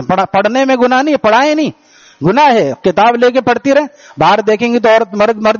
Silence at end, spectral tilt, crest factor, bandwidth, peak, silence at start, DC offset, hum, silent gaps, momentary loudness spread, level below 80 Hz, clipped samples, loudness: 0 s; -3.5 dB/octave; 10 dB; 7.4 kHz; 0 dBFS; 0 s; under 0.1%; none; none; 4 LU; -50 dBFS; under 0.1%; -11 LUFS